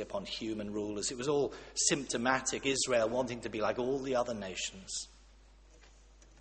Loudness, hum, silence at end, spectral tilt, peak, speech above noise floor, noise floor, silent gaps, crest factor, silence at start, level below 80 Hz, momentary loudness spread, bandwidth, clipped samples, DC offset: -34 LUFS; none; 0 s; -2.5 dB/octave; -12 dBFS; 25 dB; -59 dBFS; none; 24 dB; 0 s; -60 dBFS; 9 LU; 8.8 kHz; under 0.1%; under 0.1%